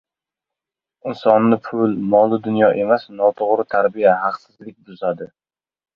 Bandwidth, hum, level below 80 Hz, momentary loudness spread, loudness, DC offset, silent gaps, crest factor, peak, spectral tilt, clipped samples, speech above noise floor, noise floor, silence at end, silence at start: 5.4 kHz; none; -62 dBFS; 14 LU; -17 LUFS; under 0.1%; none; 18 dB; 0 dBFS; -9 dB/octave; under 0.1%; 69 dB; -87 dBFS; 0.7 s; 1.05 s